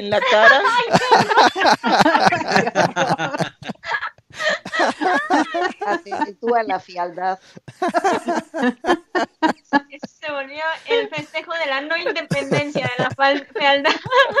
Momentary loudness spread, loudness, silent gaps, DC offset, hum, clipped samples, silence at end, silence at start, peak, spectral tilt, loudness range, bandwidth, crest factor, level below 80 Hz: 12 LU; -18 LUFS; none; under 0.1%; none; under 0.1%; 0 s; 0 s; 0 dBFS; -4 dB/octave; 6 LU; 14.5 kHz; 18 dB; -60 dBFS